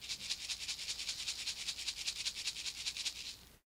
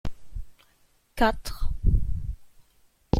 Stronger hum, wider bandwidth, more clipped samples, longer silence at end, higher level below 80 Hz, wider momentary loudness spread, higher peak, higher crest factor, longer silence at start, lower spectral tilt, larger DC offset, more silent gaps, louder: neither; about the same, 16 kHz vs 15.5 kHz; neither; about the same, 0.05 s vs 0 s; second, -66 dBFS vs -30 dBFS; second, 2 LU vs 19 LU; second, -20 dBFS vs -4 dBFS; about the same, 22 dB vs 22 dB; about the same, 0 s vs 0.05 s; second, 1.5 dB/octave vs -6.5 dB/octave; neither; neither; second, -39 LUFS vs -29 LUFS